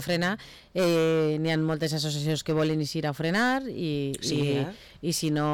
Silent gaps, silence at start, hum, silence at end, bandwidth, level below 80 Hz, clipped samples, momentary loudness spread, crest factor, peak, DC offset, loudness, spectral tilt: none; 0 s; none; 0 s; 18 kHz; -58 dBFS; under 0.1%; 6 LU; 8 dB; -18 dBFS; under 0.1%; -27 LUFS; -5 dB/octave